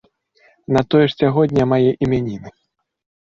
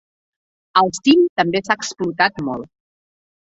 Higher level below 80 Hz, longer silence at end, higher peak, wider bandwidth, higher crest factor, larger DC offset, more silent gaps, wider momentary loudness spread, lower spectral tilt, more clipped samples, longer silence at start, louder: first, -48 dBFS vs -60 dBFS; about the same, 0.75 s vs 0.85 s; about the same, -2 dBFS vs -2 dBFS; about the same, 7.6 kHz vs 8.2 kHz; about the same, 16 dB vs 18 dB; neither; second, none vs 1.29-1.36 s; second, 8 LU vs 12 LU; first, -8 dB/octave vs -4 dB/octave; neither; about the same, 0.7 s vs 0.75 s; about the same, -17 LUFS vs -18 LUFS